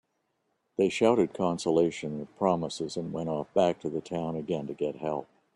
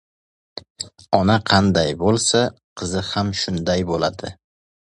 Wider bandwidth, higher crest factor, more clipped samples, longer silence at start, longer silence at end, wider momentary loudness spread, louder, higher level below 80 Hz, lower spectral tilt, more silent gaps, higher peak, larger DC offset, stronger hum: about the same, 11 kHz vs 11.5 kHz; about the same, 20 dB vs 20 dB; neither; first, 0.8 s vs 0.55 s; second, 0.3 s vs 0.55 s; second, 10 LU vs 18 LU; second, -29 LUFS vs -19 LUFS; second, -66 dBFS vs -42 dBFS; first, -6 dB/octave vs -4.5 dB/octave; second, none vs 0.70-0.75 s, 2.64-2.76 s; second, -10 dBFS vs 0 dBFS; neither; neither